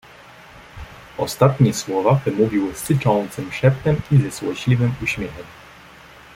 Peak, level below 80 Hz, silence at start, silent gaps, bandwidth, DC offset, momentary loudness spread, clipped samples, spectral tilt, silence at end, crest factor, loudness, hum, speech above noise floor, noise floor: -2 dBFS; -46 dBFS; 0.55 s; none; 16 kHz; under 0.1%; 18 LU; under 0.1%; -6.5 dB/octave; 0.8 s; 18 dB; -19 LUFS; none; 25 dB; -44 dBFS